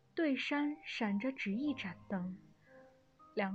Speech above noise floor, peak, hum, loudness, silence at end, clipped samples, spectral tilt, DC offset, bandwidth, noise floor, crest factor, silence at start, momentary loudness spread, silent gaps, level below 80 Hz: 27 dB; -22 dBFS; none; -38 LUFS; 0 s; under 0.1%; -6.5 dB/octave; under 0.1%; 8.2 kHz; -64 dBFS; 16 dB; 0.15 s; 9 LU; none; -76 dBFS